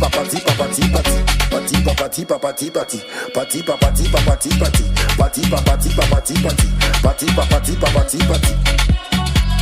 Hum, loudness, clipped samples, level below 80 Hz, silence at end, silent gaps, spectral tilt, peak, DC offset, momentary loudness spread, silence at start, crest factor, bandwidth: none; -16 LUFS; under 0.1%; -18 dBFS; 0 s; none; -4.5 dB/octave; 0 dBFS; under 0.1%; 5 LU; 0 s; 14 dB; 16 kHz